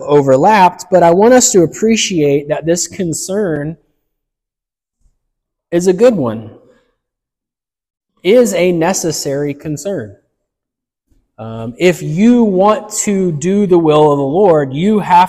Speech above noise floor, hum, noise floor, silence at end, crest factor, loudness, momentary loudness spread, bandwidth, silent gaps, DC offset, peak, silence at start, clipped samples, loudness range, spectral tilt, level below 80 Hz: 75 dB; none; -86 dBFS; 0 s; 12 dB; -12 LUFS; 13 LU; 15.5 kHz; none; under 0.1%; 0 dBFS; 0 s; under 0.1%; 8 LU; -5 dB/octave; -50 dBFS